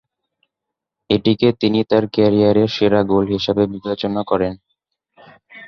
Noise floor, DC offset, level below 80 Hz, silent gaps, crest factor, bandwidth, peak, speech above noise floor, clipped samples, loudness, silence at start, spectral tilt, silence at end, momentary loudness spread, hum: -82 dBFS; under 0.1%; -48 dBFS; none; 16 dB; 6.6 kHz; -2 dBFS; 66 dB; under 0.1%; -17 LUFS; 1.1 s; -7.5 dB/octave; 0 s; 7 LU; none